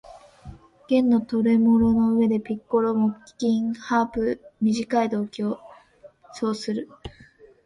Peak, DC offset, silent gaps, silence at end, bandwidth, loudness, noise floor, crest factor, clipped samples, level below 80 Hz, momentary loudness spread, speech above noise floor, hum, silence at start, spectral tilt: -8 dBFS; under 0.1%; none; 0.55 s; 10.5 kHz; -23 LUFS; -52 dBFS; 16 dB; under 0.1%; -52 dBFS; 12 LU; 29 dB; none; 0.1 s; -7 dB/octave